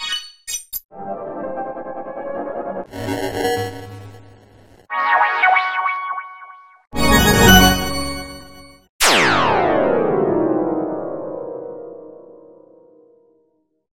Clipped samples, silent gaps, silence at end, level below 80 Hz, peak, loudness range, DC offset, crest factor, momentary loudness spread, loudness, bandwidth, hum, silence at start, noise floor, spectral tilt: under 0.1%; 0.85-0.89 s, 8.89-8.99 s; 1.55 s; -34 dBFS; 0 dBFS; 12 LU; under 0.1%; 20 dB; 19 LU; -17 LUFS; 16.5 kHz; none; 0 s; -63 dBFS; -3.5 dB/octave